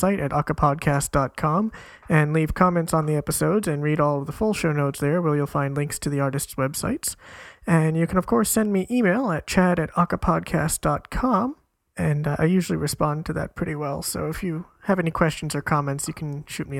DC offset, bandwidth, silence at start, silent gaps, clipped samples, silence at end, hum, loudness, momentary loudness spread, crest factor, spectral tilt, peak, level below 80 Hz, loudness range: under 0.1%; 16.5 kHz; 0 s; none; under 0.1%; 0 s; none; -23 LUFS; 8 LU; 22 dB; -6 dB/octave; -2 dBFS; -42 dBFS; 4 LU